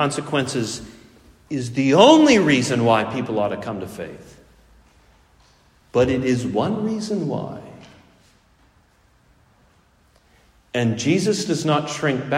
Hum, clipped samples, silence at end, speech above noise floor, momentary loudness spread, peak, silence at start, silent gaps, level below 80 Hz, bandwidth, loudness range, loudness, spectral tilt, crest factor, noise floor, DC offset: none; under 0.1%; 0 s; 38 dB; 17 LU; 0 dBFS; 0 s; none; -54 dBFS; 14 kHz; 13 LU; -19 LUFS; -5 dB/octave; 22 dB; -57 dBFS; under 0.1%